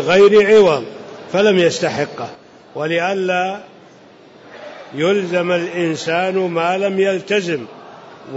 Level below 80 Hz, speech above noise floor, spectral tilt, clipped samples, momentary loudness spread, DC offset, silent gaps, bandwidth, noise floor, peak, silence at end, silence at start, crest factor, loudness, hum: -60 dBFS; 28 dB; -5 dB/octave; under 0.1%; 21 LU; under 0.1%; none; 8 kHz; -44 dBFS; -4 dBFS; 0 s; 0 s; 14 dB; -16 LUFS; none